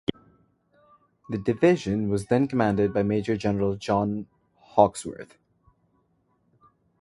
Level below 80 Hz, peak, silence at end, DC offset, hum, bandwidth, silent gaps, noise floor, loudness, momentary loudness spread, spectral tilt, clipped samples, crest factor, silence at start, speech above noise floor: -54 dBFS; -2 dBFS; 1.75 s; under 0.1%; none; 11.5 kHz; none; -69 dBFS; -25 LUFS; 13 LU; -7 dB/octave; under 0.1%; 24 dB; 0.1 s; 45 dB